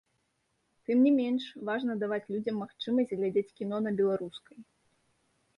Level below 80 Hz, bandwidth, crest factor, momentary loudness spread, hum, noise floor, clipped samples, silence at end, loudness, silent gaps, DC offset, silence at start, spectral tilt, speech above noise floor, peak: -76 dBFS; 5.6 kHz; 16 dB; 11 LU; none; -77 dBFS; under 0.1%; 0.95 s; -30 LUFS; none; under 0.1%; 0.9 s; -7.5 dB/octave; 47 dB; -16 dBFS